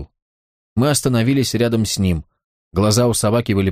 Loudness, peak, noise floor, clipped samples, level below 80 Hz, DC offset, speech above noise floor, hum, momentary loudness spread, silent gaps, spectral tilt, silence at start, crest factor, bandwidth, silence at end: -18 LUFS; -4 dBFS; under -90 dBFS; under 0.1%; -40 dBFS; under 0.1%; over 74 dB; none; 7 LU; 0.22-0.76 s, 2.44-2.71 s; -5 dB/octave; 0 s; 14 dB; 15.5 kHz; 0 s